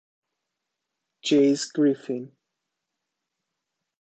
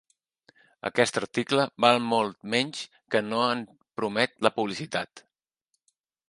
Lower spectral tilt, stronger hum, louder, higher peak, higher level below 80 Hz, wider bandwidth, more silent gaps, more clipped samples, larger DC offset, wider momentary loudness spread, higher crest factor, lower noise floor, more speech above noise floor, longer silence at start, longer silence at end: about the same, -4.5 dB/octave vs -4 dB/octave; neither; first, -23 LUFS vs -26 LUFS; second, -10 dBFS vs -4 dBFS; second, -78 dBFS vs -72 dBFS; second, 8.8 kHz vs 11.5 kHz; neither; neither; neither; about the same, 13 LU vs 11 LU; second, 18 dB vs 26 dB; first, -83 dBFS vs -79 dBFS; first, 61 dB vs 53 dB; first, 1.25 s vs 0.85 s; first, 1.75 s vs 1.1 s